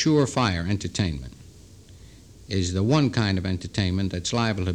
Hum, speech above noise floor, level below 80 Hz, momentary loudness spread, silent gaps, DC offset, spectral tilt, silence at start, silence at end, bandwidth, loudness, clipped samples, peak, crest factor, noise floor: none; 24 dB; -44 dBFS; 7 LU; none; under 0.1%; -5.5 dB/octave; 0 s; 0 s; 10.5 kHz; -24 LUFS; under 0.1%; -6 dBFS; 18 dB; -48 dBFS